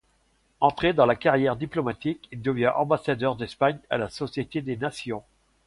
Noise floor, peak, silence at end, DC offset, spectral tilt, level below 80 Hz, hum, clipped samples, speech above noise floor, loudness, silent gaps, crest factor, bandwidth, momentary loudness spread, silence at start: -66 dBFS; -6 dBFS; 0.45 s; under 0.1%; -6.5 dB/octave; -54 dBFS; none; under 0.1%; 41 dB; -26 LUFS; none; 20 dB; 11.5 kHz; 10 LU; 0.6 s